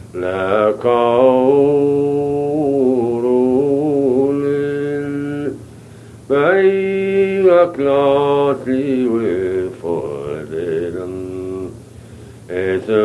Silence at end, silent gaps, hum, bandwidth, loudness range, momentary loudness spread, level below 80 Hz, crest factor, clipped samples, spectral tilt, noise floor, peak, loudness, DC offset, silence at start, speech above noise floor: 0 s; none; none; 11.5 kHz; 7 LU; 13 LU; -52 dBFS; 16 dB; under 0.1%; -7.5 dB/octave; -38 dBFS; 0 dBFS; -16 LUFS; under 0.1%; 0 s; 24 dB